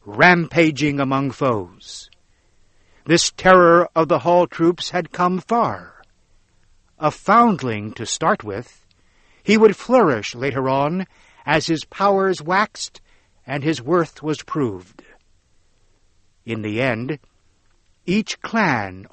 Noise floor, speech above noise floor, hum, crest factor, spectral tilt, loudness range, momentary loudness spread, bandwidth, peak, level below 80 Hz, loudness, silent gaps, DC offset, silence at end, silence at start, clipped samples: -58 dBFS; 40 dB; none; 20 dB; -5 dB/octave; 9 LU; 17 LU; 8.8 kHz; 0 dBFS; -52 dBFS; -18 LUFS; none; under 0.1%; 0.05 s; 0.05 s; under 0.1%